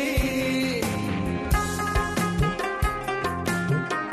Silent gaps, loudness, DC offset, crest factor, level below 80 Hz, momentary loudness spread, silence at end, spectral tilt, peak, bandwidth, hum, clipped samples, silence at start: none; -26 LUFS; under 0.1%; 14 dB; -34 dBFS; 3 LU; 0 s; -5 dB/octave; -10 dBFS; 14 kHz; none; under 0.1%; 0 s